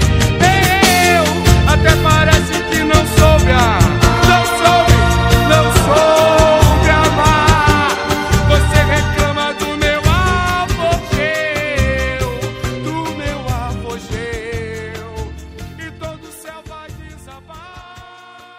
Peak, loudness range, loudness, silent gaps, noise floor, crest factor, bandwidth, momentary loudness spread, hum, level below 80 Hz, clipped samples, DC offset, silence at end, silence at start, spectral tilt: 0 dBFS; 16 LU; -13 LUFS; none; -39 dBFS; 14 dB; 16.5 kHz; 18 LU; none; -20 dBFS; 0.3%; under 0.1%; 0.55 s; 0 s; -4.5 dB/octave